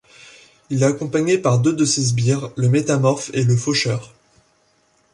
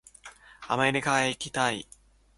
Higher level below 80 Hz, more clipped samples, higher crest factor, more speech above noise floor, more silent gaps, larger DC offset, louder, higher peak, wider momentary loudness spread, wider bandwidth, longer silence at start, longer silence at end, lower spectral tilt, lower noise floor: first, -56 dBFS vs -62 dBFS; neither; second, 16 dB vs 22 dB; first, 43 dB vs 24 dB; neither; neither; first, -18 LUFS vs -27 LUFS; first, -4 dBFS vs -8 dBFS; second, 4 LU vs 23 LU; about the same, 11.5 kHz vs 11.5 kHz; first, 0.7 s vs 0.25 s; first, 1.05 s vs 0.55 s; first, -5.5 dB/octave vs -3.5 dB/octave; first, -60 dBFS vs -51 dBFS